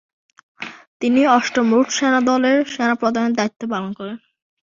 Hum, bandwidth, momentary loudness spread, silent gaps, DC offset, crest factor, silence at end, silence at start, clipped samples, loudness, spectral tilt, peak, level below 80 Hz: none; 7.6 kHz; 18 LU; 0.87-1.00 s, 3.56-3.60 s; under 0.1%; 16 dB; 0.5 s; 0.6 s; under 0.1%; -18 LUFS; -4 dB/octave; -2 dBFS; -64 dBFS